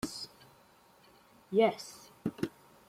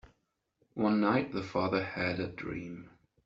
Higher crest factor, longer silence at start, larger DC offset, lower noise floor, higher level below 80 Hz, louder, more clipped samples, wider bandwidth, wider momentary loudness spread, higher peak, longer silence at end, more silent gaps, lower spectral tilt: about the same, 22 dB vs 20 dB; second, 0.05 s vs 0.75 s; neither; second, -63 dBFS vs -79 dBFS; about the same, -68 dBFS vs -64 dBFS; about the same, -34 LUFS vs -32 LUFS; neither; first, 16 kHz vs 7.4 kHz; about the same, 17 LU vs 16 LU; about the same, -14 dBFS vs -14 dBFS; about the same, 0.4 s vs 0.4 s; neither; about the same, -5 dB/octave vs -5 dB/octave